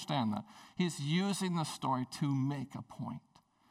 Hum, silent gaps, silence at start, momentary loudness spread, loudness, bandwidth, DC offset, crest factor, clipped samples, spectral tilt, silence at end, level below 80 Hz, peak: none; none; 0 s; 12 LU; -36 LUFS; 15 kHz; under 0.1%; 16 dB; under 0.1%; -5.5 dB/octave; 0.5 s; -76 dBFS; -20 dBFS